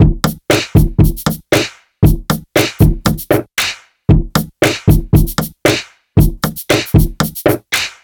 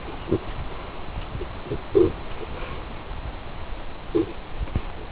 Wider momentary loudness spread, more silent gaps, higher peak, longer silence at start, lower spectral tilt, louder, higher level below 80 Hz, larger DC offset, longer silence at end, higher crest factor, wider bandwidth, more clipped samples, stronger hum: second, 7 LU vs 14 LU; neither; first, 0 dBFS vs -6 dBFS; about the same, 0 s vs 0 s; second, -5.5 dB/octave vs -11 dB/octave; first, -14 LUFS vs -29 LUFS; first, -20 dBFS vs -36 dBFS; neither; first, 0.15 s vs 0 s; second, 12 dB vs 22 dB; first, over 20 kHz vs 4 kHz; neither; neither